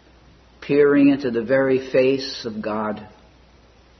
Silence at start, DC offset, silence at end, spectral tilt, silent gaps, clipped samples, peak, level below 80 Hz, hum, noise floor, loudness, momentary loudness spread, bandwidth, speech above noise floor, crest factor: 0.6 s; under 0.1%; 0.9 s; -6.5 dB/octave; none; under 0.1%; -6 dBFS; -54 dBFS; none; -51 dBFS; -19 LUFS; 13 LU; 6.4 kHz; 33 dB; 16 dB